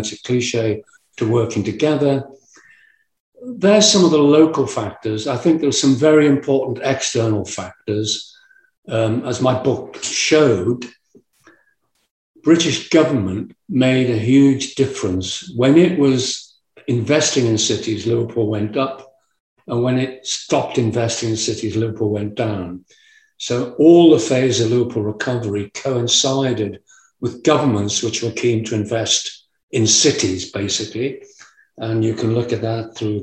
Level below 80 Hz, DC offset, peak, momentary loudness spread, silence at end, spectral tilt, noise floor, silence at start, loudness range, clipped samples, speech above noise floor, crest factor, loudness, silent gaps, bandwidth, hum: -58 dBFS; under 0.1%; 0 dBFS; 12 LU; 0 s; -4.5 dB/octave; -64 dBFS; 0 s; 6 LU; under 0.1%; 47 dB; 18 dB; -17 LUFS; 3.20-3.32 s, 8.78-8.83 s, 12.11-12.34 s, 19.40-19.56 s, 29.63-29.68 s; 9.4 kHz; none